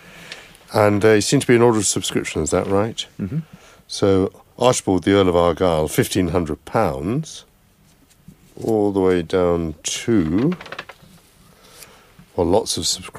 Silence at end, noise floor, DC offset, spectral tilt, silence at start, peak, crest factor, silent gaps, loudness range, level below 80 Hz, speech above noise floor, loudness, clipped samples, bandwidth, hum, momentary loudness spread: 0 s; -54 dBFS; under 0.1%; -5 dB/octave; 0.15 s; 0 dBFS; 20 dB; none; 5 LU; -44 dBFS; 36 dB; -19 LUFS; under 0.1%; 15.5 kHz; none; 14 LU